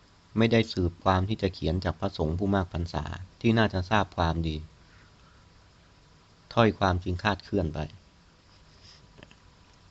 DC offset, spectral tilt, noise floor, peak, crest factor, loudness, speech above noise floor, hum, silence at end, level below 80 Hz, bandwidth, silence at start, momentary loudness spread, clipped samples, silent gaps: under 0.1%; -7 dB/octave; -58 dBFS; -6 dBFS; 24 dB; -28 LUFS; 31 dB; none; 1.95 s; -48 dBFS; 7.8 kHz; 0.35 s; 10 LU; under 0.1%; none